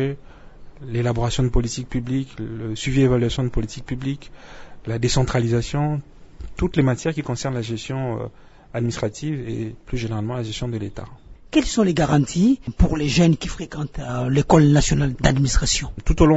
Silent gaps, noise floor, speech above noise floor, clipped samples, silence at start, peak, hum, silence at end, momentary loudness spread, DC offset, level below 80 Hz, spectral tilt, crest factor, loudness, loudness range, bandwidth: none; -40 dBFS; 20 dB; under 0.1%; 0 s; -2 dBFS; none; 0 s; 12 LU; under 0.1%; -30 dBFS; -6 dB/octave; 20 dB; -22 LUFS; 8 LU; 8 kHz